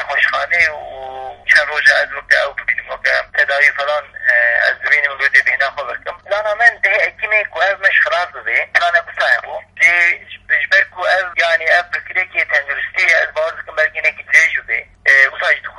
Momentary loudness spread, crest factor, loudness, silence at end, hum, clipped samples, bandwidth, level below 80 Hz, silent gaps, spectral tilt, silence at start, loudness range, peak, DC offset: 9 LU; 16 dB; -13 LUFS; 0 s; none; under 0.1%; 11.5 kHz; -54 dBFS; none; -0.5 dB/octave; 0 s; 1 LU; 0 dBFS; under 0.1%